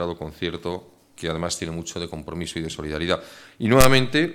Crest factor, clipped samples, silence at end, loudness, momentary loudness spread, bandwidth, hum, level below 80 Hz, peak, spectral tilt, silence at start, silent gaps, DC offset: 22 dB; under 0.1%; 0 s; -24 LUFS; 15 LU; 17.5 kHz; none; -38 dBFS; 0 dBFS; -4.5 dB/octave; 0 s; none; under 0.1%